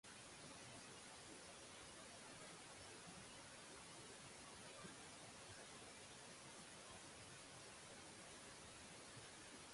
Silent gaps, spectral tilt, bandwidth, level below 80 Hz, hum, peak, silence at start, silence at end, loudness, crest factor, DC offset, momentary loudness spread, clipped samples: none; -2 dB/octave; 11.5 kHz; -78 dBFS; none; -44 dBFS; 0.05 s; 0 s; -58 LUFS; 14 dB; under 0.1%; 1 LU; under 0.1%